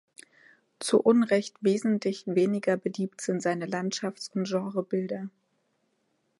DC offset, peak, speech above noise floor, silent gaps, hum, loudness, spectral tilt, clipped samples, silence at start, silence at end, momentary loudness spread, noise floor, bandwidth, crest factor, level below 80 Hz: under 0.1%; -8 dBFS; 47 dB; none; none; -28 LUFS; -5.5 dB/octave; under 0.1%; 0.8 s; 1.1 s; 10 LU; -74 dBFS; 11.5 kHz; 20 dB; -78 dBFS